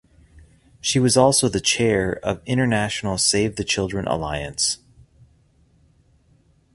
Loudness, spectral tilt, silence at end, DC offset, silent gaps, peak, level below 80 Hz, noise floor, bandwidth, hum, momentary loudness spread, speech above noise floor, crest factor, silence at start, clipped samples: -20 LUFS; -3.5 dB/octave; 2 s; under 0.1%; none; -2 dBFS; -46 dBFS; -58 dBFS; 11.5 kHz; none; 9 LU; 38 dB; 22 dB; 0.85 s; under 0.1%